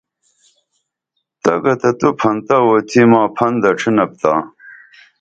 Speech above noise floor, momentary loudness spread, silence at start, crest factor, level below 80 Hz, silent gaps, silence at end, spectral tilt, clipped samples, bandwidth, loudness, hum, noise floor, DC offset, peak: 60 dB; 6 LU; 1.45 s; 16 dB; -58 dBFS; none; 0.5 s; -6.5 dB/octave; under 0.1%; 8 kHz; -14 LUFS; none; -74 dBFS; under 0.1%; 0 dBFS